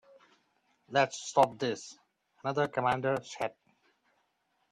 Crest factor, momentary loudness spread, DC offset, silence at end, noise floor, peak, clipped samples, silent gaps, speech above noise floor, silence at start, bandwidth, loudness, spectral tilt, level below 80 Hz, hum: 24 dB; 11 LU; under 0.1%; 1.25 s; -76 dBFS; -10 dBFS; under 0.1%; none; 46 dB; 0.9 s; 13 kHz; -31 LUFS; -4.5 dB/octave; -74 dBFS; none